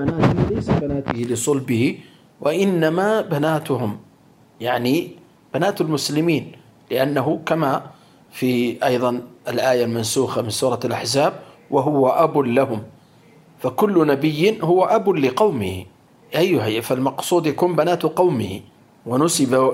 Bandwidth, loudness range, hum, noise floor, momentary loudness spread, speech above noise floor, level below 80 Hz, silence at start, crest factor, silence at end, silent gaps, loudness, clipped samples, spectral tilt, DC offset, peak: 16 kHz; 3 LU; none; -52 dBFS; 9 LU; 33 dB; -50 dBFS; 0 s; 18 dB; 0 s; none; -20 LUFS; under 0.1%; -5.5 dB/octave; under 0.1%; -2 dBFS